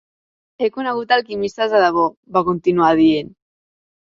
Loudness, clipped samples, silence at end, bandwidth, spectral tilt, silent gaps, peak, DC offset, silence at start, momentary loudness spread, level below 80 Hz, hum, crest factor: -17 LUFS; under 0.1%; 0.9 s; 7.4 kHz; -6.5 dB/octave; 2.17-2.23 s; -2 dBFS; under 0.1%; 0.6 s; 9 LU; -56 dBFS; none; 16 dB